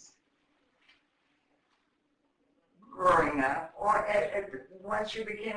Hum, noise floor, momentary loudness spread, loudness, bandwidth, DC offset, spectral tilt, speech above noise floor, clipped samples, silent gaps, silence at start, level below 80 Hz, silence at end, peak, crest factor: none; -76 dBFS; 11 LU; -29 LUFS; 10.5 kHz; under 0.1%; -5 dB/octave; 44 dB; under 0.1%; none; 2.9 s; -60 dBFS; 0 s; -12 dBFS; 20 dB